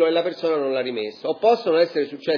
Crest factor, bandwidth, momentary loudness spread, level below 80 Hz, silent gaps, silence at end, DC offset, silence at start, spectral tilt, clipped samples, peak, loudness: 14 dB; 5.4 kHz; 8 LU; -86 dBFS; none; 0 s; under 0.1%; 0 s; -6 dB/octave; under 0.1%; -6 dBFS; -22 LUFS